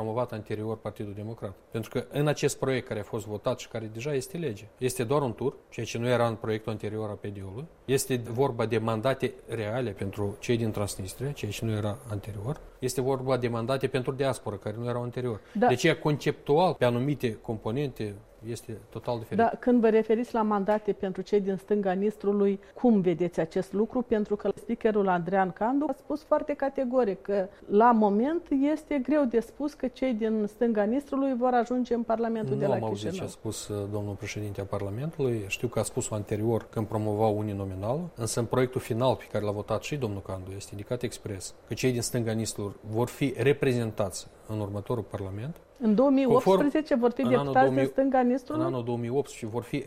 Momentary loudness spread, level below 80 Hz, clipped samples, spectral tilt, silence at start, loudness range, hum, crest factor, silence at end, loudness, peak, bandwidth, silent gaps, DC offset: 12 LU; -56 dBFS; under 0.1%; -6 dB/octave; 0 s; 6 LU; none; 18 dB; 0 s; -29 LUFS; -10 dBFS; 16 kHz; none; under 0.1%